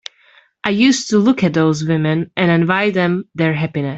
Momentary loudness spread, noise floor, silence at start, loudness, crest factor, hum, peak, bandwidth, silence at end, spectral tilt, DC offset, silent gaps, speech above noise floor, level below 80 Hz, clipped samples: 6 LU; -51 dBFS; 0.65 s; -16 LUFS; 16 dB; none; 0 dBFS; 8 kHz; 0 s; -5.5 dB/octave; under 0.1%; none; 36 dB; -54 dBFS; under 0.1%